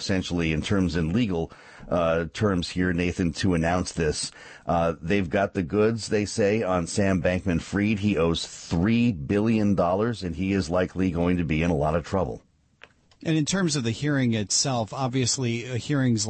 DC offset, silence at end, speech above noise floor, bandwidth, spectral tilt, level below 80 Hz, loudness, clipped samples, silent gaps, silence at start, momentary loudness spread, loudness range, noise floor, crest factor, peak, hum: under 0.1%; 0 s; 31 dB; 8.8 kHz; -5 dB/octave; -44 dBFS; -25 LUFS; under 0.1%; none; 0 s; 5 LU; 2 LU; -55 dBFS; 14 dB; -12 dBFS; none